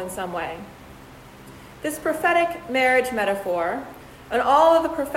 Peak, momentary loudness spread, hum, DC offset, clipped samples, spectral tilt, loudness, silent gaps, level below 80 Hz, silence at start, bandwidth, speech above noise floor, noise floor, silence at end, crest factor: -4 dBFS; 16 LU; none; under 0.1%; under 0.1%; -4 dB/octave; -22 LUFS; none; -52 dBFS; 0 s; 16 kHz; 22 dB; -44 dBFS; 0 s; 18 dB